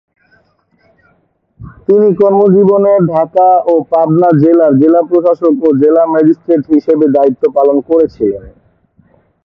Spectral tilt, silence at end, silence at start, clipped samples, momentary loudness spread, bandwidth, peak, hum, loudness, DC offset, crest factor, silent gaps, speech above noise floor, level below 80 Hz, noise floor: -11.5 dB/octave; 0.95 s; 1.6 s; under 0.1%; 5 LU; 5.4 kHz; 0 dBFS; none; -9 LUFS; under 0.1%; 10 dB; none; 47 dB; -48 dBFS; -56 dBFS